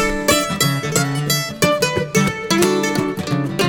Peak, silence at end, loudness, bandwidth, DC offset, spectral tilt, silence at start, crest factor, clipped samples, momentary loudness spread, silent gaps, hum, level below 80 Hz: 0 dBFS; 0 s; -17 LUFS; 19 kHz; under 0.1%; -4 dB/octave; 0 s; 18 dB; under 0.1%; 5 LU; none; none; -40 dBFS